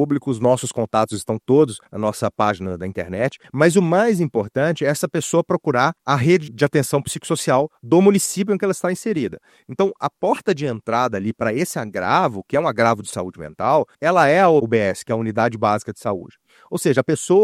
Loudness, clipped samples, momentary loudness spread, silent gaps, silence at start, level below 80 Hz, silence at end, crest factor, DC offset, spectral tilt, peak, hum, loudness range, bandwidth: -19 LUFS; under 0.1%; 9 LU; none; 0 s; -58 dBFS; 0 s; 18 dB; under 0.1%; -5.5 dB/octave; 0 dBFS; none; 3 LU; 15.5 kHz